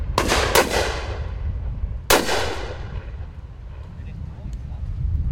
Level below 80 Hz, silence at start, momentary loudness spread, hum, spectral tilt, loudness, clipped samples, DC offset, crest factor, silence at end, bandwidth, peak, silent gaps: -30 dBFS; 0 s; 19 LU; none; -3.5 dB/octave; -23 LUFS; under 0.1%; under 0.1%; 22 dB; 0 s; 16.5 kHz; 0 dBFS; none